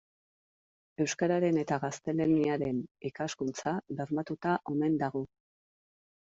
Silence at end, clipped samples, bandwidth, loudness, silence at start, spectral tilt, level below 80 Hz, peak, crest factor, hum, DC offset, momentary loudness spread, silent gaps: 1.05 s; under 0.1%; 7.8 kHz; -32 LUFS; 1 s; -6 dB/octave; -68 dBFS; -16 dBFS; 16 dB; none; under 0.1%; 9 LU; 2.91-2.95 s